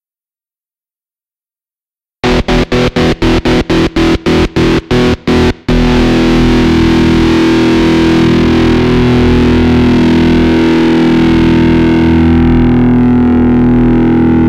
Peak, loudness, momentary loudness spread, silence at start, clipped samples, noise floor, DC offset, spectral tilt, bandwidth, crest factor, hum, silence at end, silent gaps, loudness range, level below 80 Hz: 0 dBFS; -8 LUFS; 3 LU; 2.25 s; under 0.1%; under -90 dBFS; under 0.1%; -7 dB/octave; 10.5 kHz; 8 dB; none; 0 s; none; 4 LU; -20 dBFS